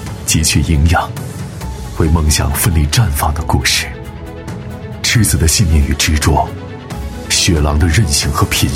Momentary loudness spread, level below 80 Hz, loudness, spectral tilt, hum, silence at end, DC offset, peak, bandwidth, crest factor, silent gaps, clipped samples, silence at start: 15 LU; -20 dBFS; -13 LUFS; -4 dB/octave; none; 0 s; under 0.1%; 0 dBFS; 16.5 kHz; 14 dB; none; under 0.1%; 0 s